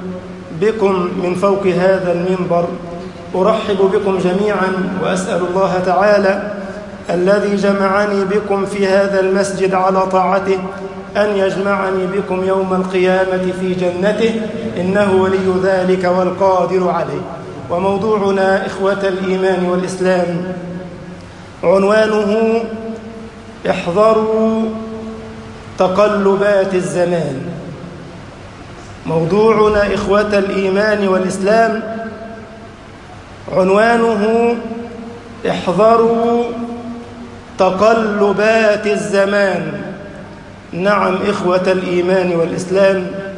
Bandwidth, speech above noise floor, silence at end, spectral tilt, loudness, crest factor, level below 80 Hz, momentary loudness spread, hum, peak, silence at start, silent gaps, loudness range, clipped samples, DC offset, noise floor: 11 kHz; 21 dB; 0 s; -6 dB/octave; -15 LUFS; 14 dB; -44 dBFS; 18 LU; none; 0 dBFS; 0 s; none; 3 LU; under 0.1%; under 0.1%; -34 dBFS